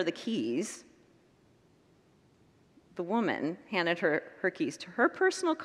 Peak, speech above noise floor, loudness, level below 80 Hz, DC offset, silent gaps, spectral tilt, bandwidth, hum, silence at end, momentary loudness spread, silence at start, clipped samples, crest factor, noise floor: -14 dBFS; 33 dB; -31 LUFS; -80 dBFS; under 0.1%; none; -4.5 dB/octave; 12.5 kHz; none; 0 s; 10 LU; 0 s; under 0.1%; 20 dB; -65 dBFS